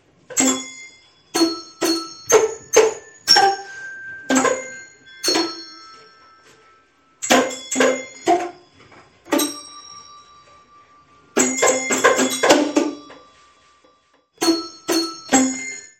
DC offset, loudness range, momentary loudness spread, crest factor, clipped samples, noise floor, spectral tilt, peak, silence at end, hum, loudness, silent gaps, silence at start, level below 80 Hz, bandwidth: under 0.1%; 6 LU; 19 LU; 22 dB; under 0.1%; -59 dBFS; -1 dB/octave; 0 dBFS; 0.15 s; none; -19 LUFS; none; 0.3 s; -64 dBFS; 16.5 kHz